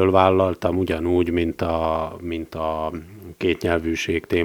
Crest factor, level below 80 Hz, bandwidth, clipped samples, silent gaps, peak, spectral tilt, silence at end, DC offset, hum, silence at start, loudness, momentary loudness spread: 22 dB; -42 dBFS; 19.5 kHz; under 0.1%; none; 0 dBFS; -6.5 dB/octave; 0 s; under 0.1%; none; 0 s; -22 LUFS; 12 LU